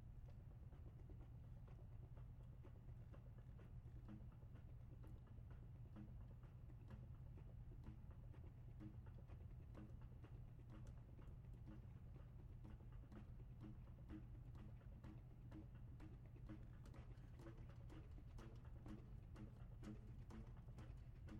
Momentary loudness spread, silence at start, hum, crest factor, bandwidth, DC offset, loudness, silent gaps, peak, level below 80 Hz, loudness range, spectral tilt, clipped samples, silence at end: 2 LU; 0 s; none; 12 dB; 8.4 kHz; under 0.1%; -61 LUFS; none; -46 dBFS; -62 dBFS; 1 LU; -8.5 dB/octave; under 0.1%; 0 s